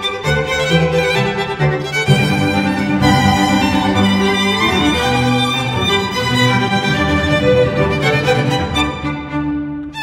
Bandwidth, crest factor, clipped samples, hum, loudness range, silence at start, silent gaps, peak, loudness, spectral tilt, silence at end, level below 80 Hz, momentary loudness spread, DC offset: 16 kHz; 14 dB; under 0.1%; none; 1 LU; 0 s; none; 0 dBFS; -14 LUFS; -5 dB/octave; 0 s; -34 dBFS; 5 LU; 0.1%